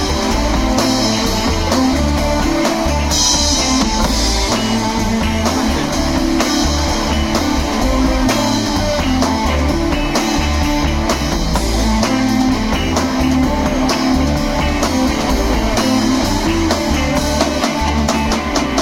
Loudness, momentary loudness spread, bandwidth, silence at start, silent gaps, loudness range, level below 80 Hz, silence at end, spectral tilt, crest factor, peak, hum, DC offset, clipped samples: -15 LUFS; 2 LU; 16.5 kHz; 0 s; none; 2 LU; -22 dBFS; 0 s; -4 dB/octave; 14 dB; 0 dBFS; none; under 0.1%; under 0.1%